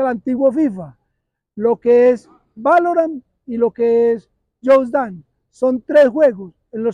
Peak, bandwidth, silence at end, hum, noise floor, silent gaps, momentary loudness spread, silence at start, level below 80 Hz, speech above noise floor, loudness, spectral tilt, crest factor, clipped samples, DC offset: -4 dBFS; 9.4 kHz; 0 s; none; -74 dBFS; none; 13 LU; 0 s; -60 dBFS; 59 dB; -16 LUFS; -7.5 dB/octave; 12 dB; under 0.1%; under 0.1%